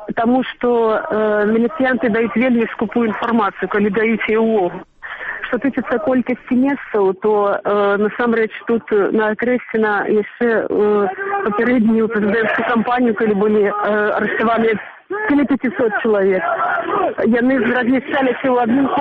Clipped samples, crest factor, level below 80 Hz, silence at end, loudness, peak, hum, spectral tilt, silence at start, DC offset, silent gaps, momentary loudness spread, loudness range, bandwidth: under 0.1%; 10 dB; -52 dBFS; 0 s; -16 LUFS; -6 dBFS; none; -8.5 dB/octave; 0 s; under 0.1%; none; 4 LU; 2 LU; 4.6 kHz